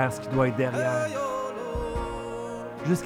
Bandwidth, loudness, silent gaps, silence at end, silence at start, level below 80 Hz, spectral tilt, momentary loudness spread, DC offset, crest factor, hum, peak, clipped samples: 17 kHz; -29 LUFS; none; 0 s; 0 s; -44 dBFS; -6.5 dB/octave; 9 LU; under 0.1%; 18 dB; none; -10 dBFS; under 0.1%